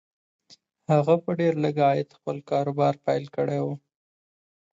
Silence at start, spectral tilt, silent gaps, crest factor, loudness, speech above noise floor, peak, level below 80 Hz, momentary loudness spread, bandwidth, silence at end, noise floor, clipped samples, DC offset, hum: 0.9 s; -8 dB/octave; none; 20 dB; -25 LUFS; over 66 dB; -6 dBFS; -72 dBFS; 11 LU; 7.8 kHz; 1 s; under -90 dBFS; under 0.1%; under 0.1%; none